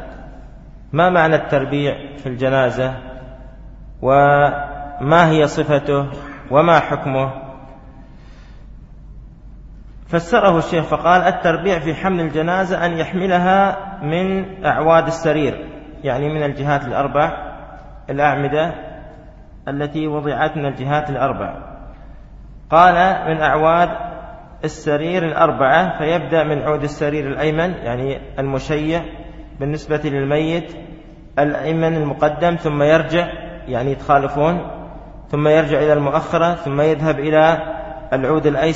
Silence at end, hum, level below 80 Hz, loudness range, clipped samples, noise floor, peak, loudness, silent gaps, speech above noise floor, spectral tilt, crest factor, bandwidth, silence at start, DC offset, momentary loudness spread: 0 s; none; -38 dBFS; 5 LU; under 0.1%; -39 dBFS; 0 dBFS; -17 LUFS; none; 23 dB; -7 dB/octave; 18 dB; 8 kHz; 0 s; under 0.1%; 17 LU